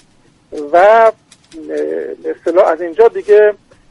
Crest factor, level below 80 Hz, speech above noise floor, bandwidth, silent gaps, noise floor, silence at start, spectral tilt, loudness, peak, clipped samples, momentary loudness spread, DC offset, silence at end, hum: 12 dB; -54 dBFS; 39 dB; 10.5 kHz; none; -50 dBFS; 0.5 s; -4.5 dB/octave; -12 LUFS; 0 dBFS; under 0.1%; 19 LU; under 0.1%; 0.35 s; none